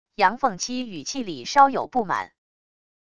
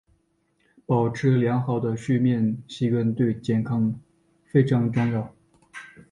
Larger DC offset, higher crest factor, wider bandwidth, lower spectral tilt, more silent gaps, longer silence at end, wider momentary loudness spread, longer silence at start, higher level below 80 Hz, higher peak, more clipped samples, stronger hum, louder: first, 0.5% vs under 0.1%; about the same, 22 dB vs 18 dB; about the same, 10 kHz vs 9.8 kHz; second, -3 dB/octave vs -8.5 dB/octave; neither; first, 0.75 s vs 0.25 s; second, 12 LU vs 17 LU; second, 0.2 s vs 0.9 s; about the same, -62 dBFS vs -58 dBFS; first, -2 dBFS vs -6 dBFS; neither; neither; about the same, -23 LUFS vs -24 LUFS